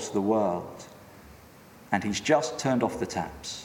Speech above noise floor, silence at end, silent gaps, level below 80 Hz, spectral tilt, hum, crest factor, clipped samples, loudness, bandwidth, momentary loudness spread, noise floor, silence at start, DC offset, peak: 24 dB; 0 s; none; -58 dBFS; -4.5 dB/octave; none; 20 dB; under 0.1%; -28 LUFS; 17 kHz; 14 LU; -51 dBFS; 0 s; under 0.1%; -8 dBFS